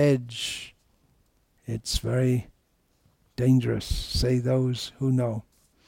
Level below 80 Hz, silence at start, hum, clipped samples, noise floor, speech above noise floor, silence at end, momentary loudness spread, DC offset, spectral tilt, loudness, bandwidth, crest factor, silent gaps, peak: -40 dBFS; 0 s; none; under 0.1%; -68 dBFS; 43 dB; 0.45 s; 14 LU; under 0.1%; -6 dB/octave; -26 LUFS; 16.5 kHz; 16 dB; none; -12 dBFS